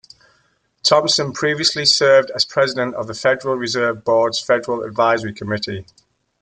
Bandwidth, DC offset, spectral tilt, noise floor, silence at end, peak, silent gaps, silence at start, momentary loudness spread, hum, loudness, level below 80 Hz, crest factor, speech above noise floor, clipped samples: 9.4 kHz; under 0.1%; -3 dB/octave; -62 dBFS; 0.6 s; -2 dBFS; none; 0.85 s; 10 LU; none; -17 LUFS; -60 dBFS; 18 dB; 44 dB; under 0.1%